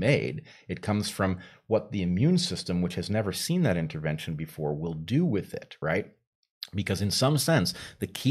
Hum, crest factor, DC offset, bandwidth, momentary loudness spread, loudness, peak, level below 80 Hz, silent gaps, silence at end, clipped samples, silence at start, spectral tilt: none; 20 dB; under 0.1%; 15.5 kHz; 12 LU; -28 LUFS; -8 dBFS; -56 dBFS; 6.27-6.43 s, 6.50-6.61 s; 0 s; under 0.1%; 0 s; -5.5 dB/octave